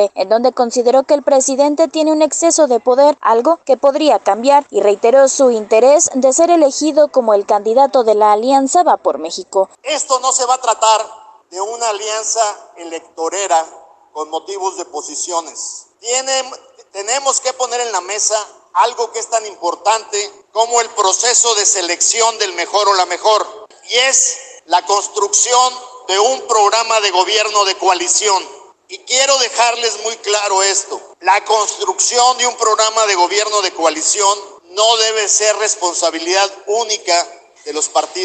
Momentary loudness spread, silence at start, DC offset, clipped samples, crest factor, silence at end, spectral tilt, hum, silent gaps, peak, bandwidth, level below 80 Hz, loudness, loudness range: 11 LU; 0 s; under 0.1%; under 0.1%; 14 dB; 0 s; 0 dB/octave; none; none; 0 dBFS; 9.6 kHz; -70 dBFS; -13 LUFS; 8 LU